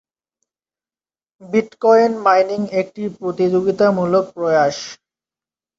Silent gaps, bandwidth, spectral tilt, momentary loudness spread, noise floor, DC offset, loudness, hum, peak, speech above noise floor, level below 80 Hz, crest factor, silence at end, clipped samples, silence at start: none; 7.8 kHz; -6 dB/octave; 12 LU; under -90 dBFS; under 0.1%; -17 LUFS; none; -2 dBFS; over 74 dB; -62 dBFS; 16 dB; 0.85 s; under 0.1%; 1.4 s